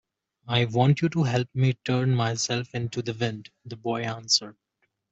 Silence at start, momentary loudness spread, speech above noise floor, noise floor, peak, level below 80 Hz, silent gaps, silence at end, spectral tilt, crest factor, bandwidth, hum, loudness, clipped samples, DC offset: 0.45 s; 9 LU; 50 dB; -75 dBFS; -6 dBFS; -62 dBFS; none; 0.6 s; -5 dB/octave; 20 dB; 8 kHz; none; -25 LUFS; under 0.1%; under 0.1%